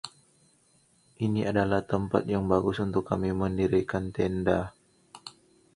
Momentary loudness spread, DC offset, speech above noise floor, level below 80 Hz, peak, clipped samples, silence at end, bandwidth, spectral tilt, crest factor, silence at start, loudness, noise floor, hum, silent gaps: 17 LU; under 0.1%; 38 dB; -50 dBFS; -8 dBFS; under 0.1%; 0.45 s; 11.5 kHz; -7.5 dB/octave; 22 dB; 0.05 s; -28 LUFS; -65 dBFS; none; none